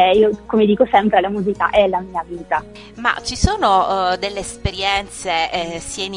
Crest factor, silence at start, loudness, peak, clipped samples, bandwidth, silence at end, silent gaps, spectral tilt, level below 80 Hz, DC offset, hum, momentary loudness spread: 18 dB; 0 s; -18 LUFS; 0 dBFS; under 0.1%; 11 kHz; 0 s; none; -4.5 dB/octave; -34 dBFS; under 0.1%; none; 10 LU